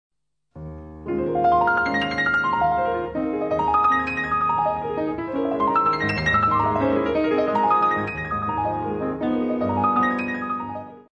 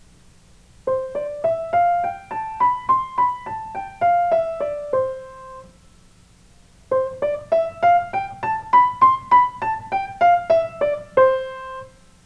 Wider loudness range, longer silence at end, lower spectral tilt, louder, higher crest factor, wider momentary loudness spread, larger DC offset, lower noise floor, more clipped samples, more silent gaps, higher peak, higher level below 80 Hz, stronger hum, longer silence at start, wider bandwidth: second, 2 LU vs 7 LU; second, 0.1 s vs 0.35 s; first, -7 dB/octave vs -5.5 dB/octave; about the same, -22 LUFS vs -20 LUFS; about the same, 14 dB vs 18 dB; second, 8 LU vs 14 LU; neither; second, -47 dBFS vs -51 dBFS; neither; neither; second, -8 dBFS vs -4 dBFS; first, -46 dBFS vs -54 dBFS; neither; second, 0.55 s vs 0.85 s; second, 8.8 kHz vs 10.5 kHz